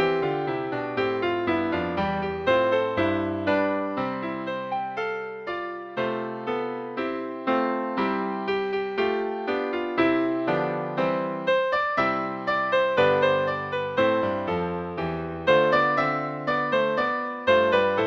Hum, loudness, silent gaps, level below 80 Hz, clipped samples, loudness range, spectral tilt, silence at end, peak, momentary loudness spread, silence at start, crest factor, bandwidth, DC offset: none; -25 LUFS; none; -58 dBFS; under 0.1%; 5 LU; -7 dB/octave; 0 s; -8 dBFS; 9 LU; 0 s; 16 dB; 7.2 kHz; under 0.1%